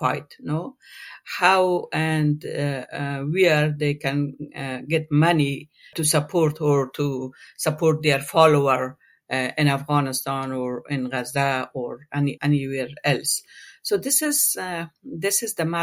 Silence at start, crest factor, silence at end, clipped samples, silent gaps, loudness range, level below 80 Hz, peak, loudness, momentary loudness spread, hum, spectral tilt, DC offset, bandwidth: 0 s; 20 dB; 0 s; under 0.1%; none; 3 LU; -62 dBFS; -2 dBFS; -22 LUFS; 12 LU; none; -4.5 dB/octave; under 0.1%; 16.5 kHz